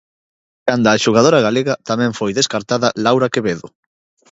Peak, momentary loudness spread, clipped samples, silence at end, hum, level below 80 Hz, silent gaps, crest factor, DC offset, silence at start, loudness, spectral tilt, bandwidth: 0 dBFS; 8 LU; under 0.1%; 0.65 s; none; -54 dBFS; none; 16 dB; under 0.1%; 0.65 s; -15 LUFS; -4.5 dB/octave; 8 kHz